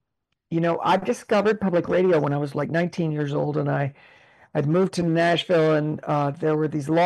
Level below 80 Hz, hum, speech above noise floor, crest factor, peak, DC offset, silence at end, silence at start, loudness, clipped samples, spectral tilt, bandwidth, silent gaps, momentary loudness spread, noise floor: -62 dBFS; none; 57 dB; 12 dB; -12 dBFS; under 0.1%; 0 s; 0.5 s; -23 LUFS; under 0.1%; -7 dB/octave; 12 kHz; none; 6 LU; -79 dBFS